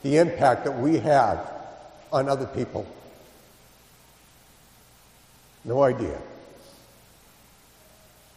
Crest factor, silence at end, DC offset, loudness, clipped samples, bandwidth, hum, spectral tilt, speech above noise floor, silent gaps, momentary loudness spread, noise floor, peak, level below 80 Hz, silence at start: 22 dB; 1.95 s; under 0.1%; -24 LUFS; under 0.1%; 15.5 kHz; none; -6.5 dB/octave; 32 dB; none; 23 LU; -55 dBFS; -6 dBFS; -56 dBFS; 0.05 s